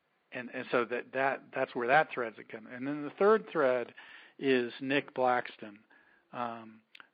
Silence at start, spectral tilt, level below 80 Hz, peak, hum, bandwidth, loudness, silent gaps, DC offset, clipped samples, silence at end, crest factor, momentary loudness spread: 0.3 s; -3 dB/octave; -86 dBFS; -12 dBFS; none; 4.9 kHz; -32 LUFS; none; under 0.1%; under 0.1%; 0.4 s; 22 dB; 20 LU